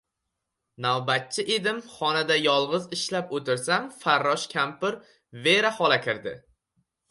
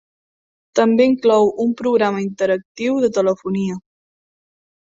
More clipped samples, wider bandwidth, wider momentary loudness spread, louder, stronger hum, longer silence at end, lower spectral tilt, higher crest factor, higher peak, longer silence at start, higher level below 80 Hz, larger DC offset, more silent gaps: neither; first, 11.5 kHz vs 7.8 kHz; about the same, 9 LU vs 8 LU; second, -25 LUFS vs -18 LUFS; neither; second, 0.7 s vs 1.1 s; second, -3 dB/octave vs -6 dB/octave; about the same, 20 dB vs 16 dB; second, -6 dBFS vs -2 dBFS; about the same, 0.8 s vs 0.75 s; second, -72 dBFS vs -62 dBFS; neither; second, none vs 2.65-2.75 s